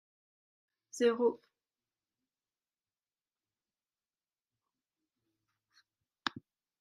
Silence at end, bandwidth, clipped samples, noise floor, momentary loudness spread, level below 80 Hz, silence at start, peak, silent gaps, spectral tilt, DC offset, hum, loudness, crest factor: 0.4 s; 11.5 kHz; under 0.1%; under -90 dBFS; 19 LU; -90 dBFS; 0.95 s; -12 dBFS; none; -3.5 dB/octave; under 0.1%; none; -34 LUFS; 30 dB